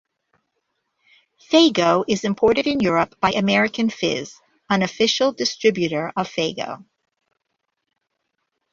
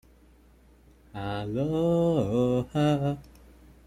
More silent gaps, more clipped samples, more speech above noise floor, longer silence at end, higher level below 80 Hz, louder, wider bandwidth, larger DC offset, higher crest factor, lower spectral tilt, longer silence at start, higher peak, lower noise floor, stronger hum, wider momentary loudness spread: neither; neither; first, 57 dB vs 31 dB; first, 1.9 s vs 0.65 s; second, -58 dBFS vs -52 dBFS; first, -20 LUFS vs -27 LUFS; second, 7.8 kHz vs 14 kHz; neither; first, 20 dB vs 14 dB; second, -4.5 dB/octave vs -8 dB/octave; first, 1.5 s vs 1.15 s; first, -2 dBFS vs -14 dBFS; first, -77 dBFS vs -57 dBFS; neither; second, 9 LU vs 12 LU